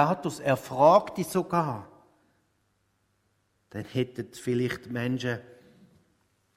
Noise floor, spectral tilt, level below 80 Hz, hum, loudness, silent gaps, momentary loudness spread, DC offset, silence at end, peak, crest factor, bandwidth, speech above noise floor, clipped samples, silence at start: -72 dBFS; -6 dB/octave; -66 dBFS; none; -27 LUFS; none; 16 LU; under 0.1%; 1.15 s; -8 dBFS; 22 dB; 16 kHz; 46 dB; under 0.1%; 0 s